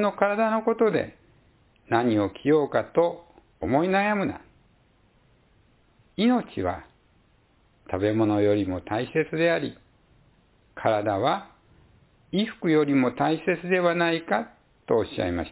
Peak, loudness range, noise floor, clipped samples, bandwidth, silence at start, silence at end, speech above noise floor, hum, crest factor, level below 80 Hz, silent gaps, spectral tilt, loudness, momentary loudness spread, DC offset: -8 dBFS; 5 LU; -62 dBFS; under 0.1%; 4 kHz; 0 s; 0 s; 38 dB; none; 18 dB; -54 dBFS; none; -10.5 dB/octave; -25 LUFS; 9 LU; under 0.1%